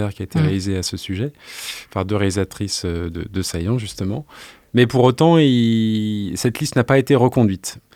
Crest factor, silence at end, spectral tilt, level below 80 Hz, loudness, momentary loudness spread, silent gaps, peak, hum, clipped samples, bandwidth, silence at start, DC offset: 18 dB; 0.15 s; -6 dB/octave; -48 dBFS; -19 LUFS; 12 LU; none; 0 dBFS; none; under 0.1%; 16.5 kHz; 0 s; under 0.1%